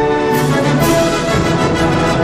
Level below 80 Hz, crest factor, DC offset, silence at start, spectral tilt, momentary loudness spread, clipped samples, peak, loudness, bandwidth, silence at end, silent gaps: -30 dBFS; 10 dB; under 0.1%; 0 s; -5.5 dB/octave; 2 LU; under 0.1%; -4 dBFS; -13 LUFS; 15.5 kHz; 0 s; none